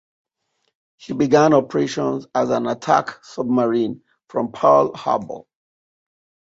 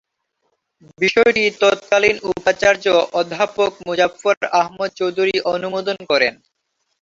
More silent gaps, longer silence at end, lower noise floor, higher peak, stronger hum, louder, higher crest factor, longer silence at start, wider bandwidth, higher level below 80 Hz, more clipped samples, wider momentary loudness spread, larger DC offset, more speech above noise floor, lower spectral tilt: second, none vs 4.37-4.41 s; first, 1.15 s vs 0.7 s; about the same, -72 dBFS vs -71 dBFS; about the same, -2 dBFS vs -2 dBFS; neither; about the same, -19 LUFS vs -17 LUFS; about the same, 18 dB vs 18 dB; about the same, 1.05 s vs 1 s; about the same, 8 kHz vs 7.8 kHz; second, -62 dBFS vs -56 dBFS; neither; first, 15 LU vs 7 LU; neither; about the same, 53 dB vs 54 dB; first, -6 dB/octave vs -3.5 dB/octave